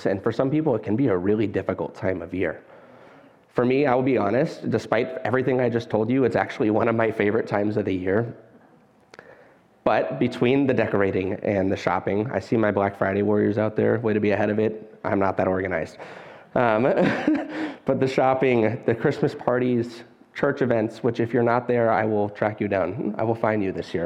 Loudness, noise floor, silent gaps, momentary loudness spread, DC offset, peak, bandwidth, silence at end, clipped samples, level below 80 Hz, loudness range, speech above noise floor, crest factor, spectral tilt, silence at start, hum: -23 LUFS; -56 dBFS; none; 7 LU; under 0.1%; -4 dBFS; 9.8 kHz; 0 s; under 0.1%; -60 dBFS; 3 LU; 33 dB; 18 dB; -8 dB/octave; 0 s; none